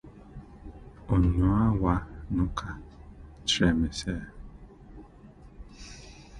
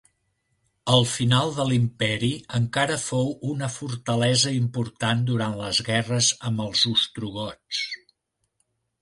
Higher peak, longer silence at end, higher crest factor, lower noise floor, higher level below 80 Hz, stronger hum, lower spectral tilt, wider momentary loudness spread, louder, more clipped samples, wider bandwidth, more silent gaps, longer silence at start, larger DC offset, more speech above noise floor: second, -10 dBFS vs -6 dBFS; second, 0 s vs 1.05 s; about the same, 20 dB vs 18 dB; second, -51 dBFS vs -76 dBFS; first, -38 dBFS vs -56 dBFS; neither; first, -5.5 dB/octave vs -4 dB/octave; first, 26 LU vs 10 LU; second, -27 LUFS vs -24 LUFS; neither; about the same, 11.5 kHz vs 11.5 kHz; neither; second, 0.05 s vs 0.85 s; neither; second, 25 dB vs 52 dB